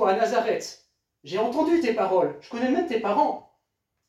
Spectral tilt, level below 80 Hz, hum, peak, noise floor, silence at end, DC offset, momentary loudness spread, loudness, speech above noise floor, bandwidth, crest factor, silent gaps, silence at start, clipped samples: -5 dB/octave; -66 dBFS; none; -8 dBFS; -79 dBFS; 0.7 s; under 0.1%; 8 LU; -24 LUFS; 55 dB; 13.5 kHz; 16 dB; none; 0 s; under 0.1%